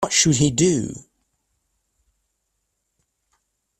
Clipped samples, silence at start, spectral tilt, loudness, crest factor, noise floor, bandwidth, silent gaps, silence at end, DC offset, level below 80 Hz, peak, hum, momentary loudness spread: under 0.1%; 0 s; -4 dB/octave; -18 LUFS; 20 dB; -75 dBFS; 13.5 kHz; none; 2.8 s; under 0.1%; -52 dBFS; -4 dBFS; none; 17 LU